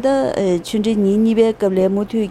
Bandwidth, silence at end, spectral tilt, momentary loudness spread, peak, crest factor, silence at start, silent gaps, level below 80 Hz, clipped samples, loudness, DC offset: 13.5 kHz; 0 s; -7 dB/octave; 4 LU; -2 dBFS; 14 dB; 0 s; none; -46 dBFS; under 0.1%; -17 LUFS; under 0.1%